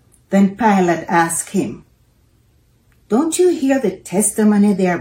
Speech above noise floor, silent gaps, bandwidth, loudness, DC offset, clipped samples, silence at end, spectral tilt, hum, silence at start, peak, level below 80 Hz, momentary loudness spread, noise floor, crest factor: 40 dB; none; 16.5 kHz; -16 LUFS; under 0.1%; under 0.1%; 0 s; -5.5 dB/octave; none; 0.3 s; -2 dBFS; -54 dBFS; 6 LU; -55 dBFS; 16 dB